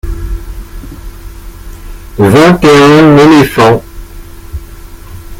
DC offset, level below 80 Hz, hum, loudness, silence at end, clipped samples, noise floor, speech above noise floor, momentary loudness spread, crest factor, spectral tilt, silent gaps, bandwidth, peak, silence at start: under 0.1%; -24 dBFS; none; -5 LUFS; 0.05 s; 3%; -27 dBFS; 24 dB; 25 LU; 8 dB; -6 dB/octave; none; 17 kHz; 0 dBFS; 0.05 s